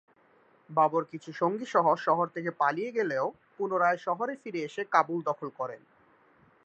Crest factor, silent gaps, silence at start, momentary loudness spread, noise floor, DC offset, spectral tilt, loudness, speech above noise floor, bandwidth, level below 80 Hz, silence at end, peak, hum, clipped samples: 22 dB; none; 0.7 s; 10 LU; -63 dBFS; under 0.1%; -6 dB/octave; -29 LUFS; 34 dB; 8.4 kHz; -84 dBFS; 0.9 s; -8 dBFS; none; under 0.1%